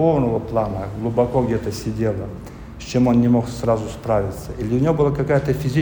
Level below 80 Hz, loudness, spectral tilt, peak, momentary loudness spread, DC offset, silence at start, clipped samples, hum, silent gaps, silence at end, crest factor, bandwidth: -38 dBFS; -20 LUFS; -7.5 dB/octave; -6 dBFS; 11 LU; under 0.1%; 0 s; under 0.1%; none; none; 0 s; 14 dB; over 20 kHz